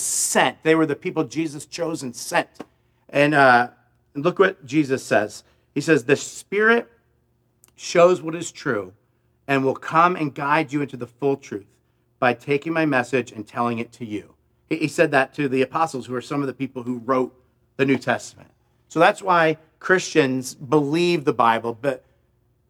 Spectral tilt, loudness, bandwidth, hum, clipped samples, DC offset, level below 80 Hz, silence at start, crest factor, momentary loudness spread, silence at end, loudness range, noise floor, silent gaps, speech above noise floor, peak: -4.5 dB/octave; -21 LUFS; 16 kHz; none; under 0.1%; under 0.1%; -68 dBFS; 0 s; 20 dB; 12 LU; 0.7 s; 4 LU; -65 dBFS; none; 44 dB; -2 dBFS